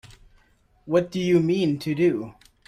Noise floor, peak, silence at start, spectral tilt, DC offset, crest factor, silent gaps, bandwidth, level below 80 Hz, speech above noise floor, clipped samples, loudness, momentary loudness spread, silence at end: -61 dBFS; -8 dBFS; 0.85 s; -7 dB/octave; under 0.1%; 16 dB; none; 12.5 kHz; -58 dBFS; 39 dB; under 0.1%; -23 LUFS; 7 LU; 0.35 s